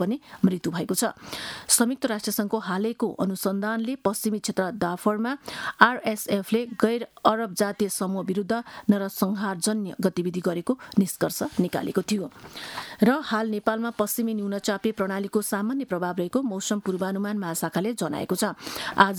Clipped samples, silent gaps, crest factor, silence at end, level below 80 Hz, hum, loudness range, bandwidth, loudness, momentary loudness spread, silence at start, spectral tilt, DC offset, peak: under 0.1%; none; 26 dB; 0 s; -64 dBFS; none; 3 LU; 19.5 kHz; -26 LUFS; 7 LU; 0 s; -4.5 dB/octave; under 0.1%; 0 dBFS